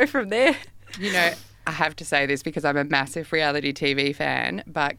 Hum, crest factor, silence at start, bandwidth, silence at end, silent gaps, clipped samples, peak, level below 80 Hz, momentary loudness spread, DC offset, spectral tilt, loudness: none; 22 dB; 0 s; 17 kHz; 0.05 s; none; under 0.1%; -2 dBFS; -58 dBFS; 8 LU; under 0.1%; -4 dB/octave; -23 LUFS